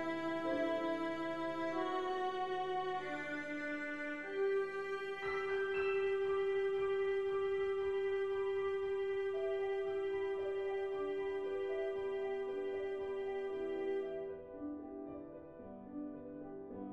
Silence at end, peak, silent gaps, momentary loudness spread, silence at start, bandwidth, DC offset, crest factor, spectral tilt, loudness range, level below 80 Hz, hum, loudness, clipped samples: 0 s; -26 dBFS; none; 11 LU; 0 s; 8 kHz; under 0.1%; 12 dB; -5.5 dB/octave; 6 LU; -70 dBFS; none; -39 LUFS; under 0.1%